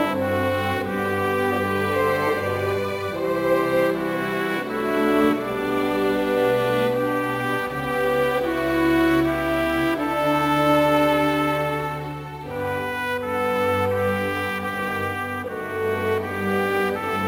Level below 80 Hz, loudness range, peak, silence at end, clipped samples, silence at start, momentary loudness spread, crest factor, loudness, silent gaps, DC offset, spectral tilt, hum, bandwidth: -48 dBFS; 4 LU; -6 dBFS; 0 s; under 0.1%; 0 s; 7 LU; 16 dB; -22 LUFS; none; under 0.1%; -6 dB/octave; none; 17 kHz